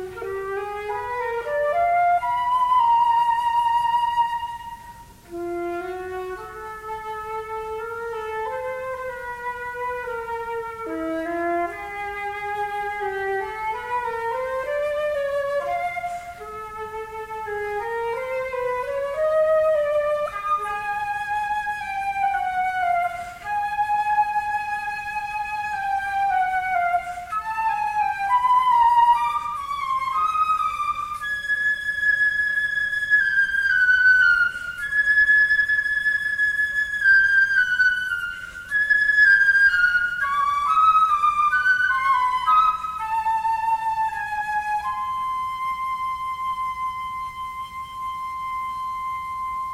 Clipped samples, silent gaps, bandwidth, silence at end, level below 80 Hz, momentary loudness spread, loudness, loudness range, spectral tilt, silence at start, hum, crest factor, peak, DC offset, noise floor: under 0.1%; none; 16 kHz; 0 s; -52 dBFS; 14 LU; -22 LUFS; 11 LU; -3 dB/octave; 0 s; none; 16 dB; -8 dBFS; under 0.1%; -43 dBFS